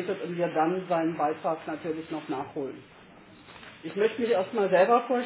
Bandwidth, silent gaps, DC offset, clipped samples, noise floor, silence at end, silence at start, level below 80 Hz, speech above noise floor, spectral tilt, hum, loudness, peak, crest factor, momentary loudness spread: 4 kHz; none; under 0.1%; under 0.1%; -52 dBFS; 0 s; 0 s; -70 dBFS; 24 dB; -10 dB/octave; none; -28 LUFS; -10 dBFS; 18 dB; 15 LU